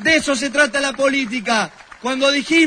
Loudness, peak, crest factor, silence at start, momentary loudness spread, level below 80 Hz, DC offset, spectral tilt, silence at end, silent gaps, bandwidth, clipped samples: -17 LUFS; -2 dBFS; 16 dB; 0 s; 8 LU; -52 dBFS; under 0.1%; -2.5 dB/octave; 0 s; none; 10.5 kHz; under 0.1%